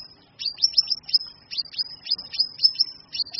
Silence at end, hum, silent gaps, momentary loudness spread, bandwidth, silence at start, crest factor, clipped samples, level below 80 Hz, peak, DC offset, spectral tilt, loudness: 0 s; none; none; 11 LU; 6.2 kHz; 0 s; 22 dB; under 0.1%; -66 dBFS; -4 dBFS; under 0.1%; 2.5 dB/octave; -22 LUFS